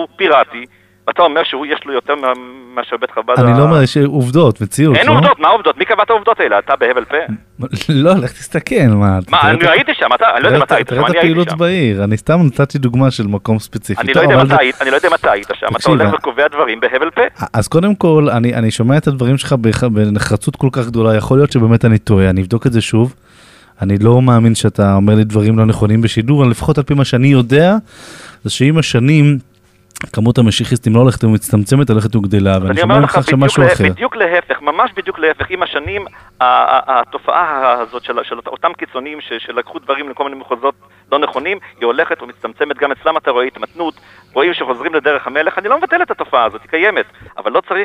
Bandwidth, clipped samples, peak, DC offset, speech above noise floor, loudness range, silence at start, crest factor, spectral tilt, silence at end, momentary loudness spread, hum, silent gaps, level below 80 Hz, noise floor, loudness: 14 kHz; under 0.1%; 0 dBFS; under 0.1%; 31 dB; 6 LU; 0 s; 12 dB; -6.5 dB/octave; 0 s; 11 LU; 50 Hz at -40 dBFS; none; -42 dBFS; -43 dBFS; -12 LUFS